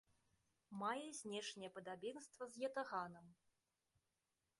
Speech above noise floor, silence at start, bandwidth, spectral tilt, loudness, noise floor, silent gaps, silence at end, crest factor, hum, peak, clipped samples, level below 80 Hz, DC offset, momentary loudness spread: over 41 dB; 0.7 s; 11.5 kHz; -3.5 dB/octave; -49 LUFS; under -90 dBFS; none; 1.25 s; 20 dB; none; -32 dBFS; under 0.1%; under -90 dBFS; under 0.1%; 9 LU